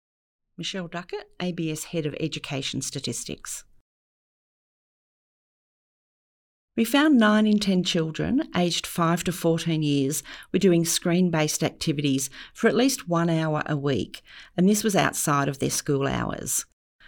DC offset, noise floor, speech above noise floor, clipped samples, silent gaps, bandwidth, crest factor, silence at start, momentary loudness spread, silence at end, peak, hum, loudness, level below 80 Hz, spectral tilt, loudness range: under 0.1%; under -90 dBFS; over 66 dB; under 0.1%; 3.81-6.68 s; over 20 kHz; 18 dB; 0.6 s; 12 LU; 0.45 s; -6 dBFS; none; -24 LUFS; -54 dBFS; -4.5 dB/octave; 11 LU